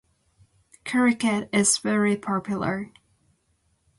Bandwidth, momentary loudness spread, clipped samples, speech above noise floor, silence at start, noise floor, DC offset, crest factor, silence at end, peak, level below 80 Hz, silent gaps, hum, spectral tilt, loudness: 11.5 kHz; 11 LU; under 0.1%; 46 dB; 0.85 s; -69 dBFS; under 0.1%; 20 dB; 1.1 s; -6 dBFS; -62 dBFS; none; none; -3.5 dB/octave; -23 LUFS